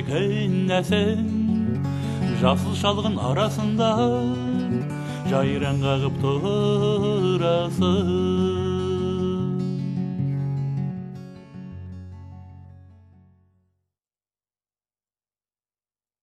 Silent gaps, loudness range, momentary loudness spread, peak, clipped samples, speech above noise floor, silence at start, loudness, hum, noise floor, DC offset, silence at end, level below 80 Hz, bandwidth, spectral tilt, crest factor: none; 12 LU; 17 LU; -4 dBFS; under 0.1%; over 69 dB; 0 s; -23 LUFS; 50 Hz at -55 dBFS; under -90 dBFS; under 0.1%; 3.3 s; -52 dBFS; 12.5 kHz; -7 dB/octave; 20 dB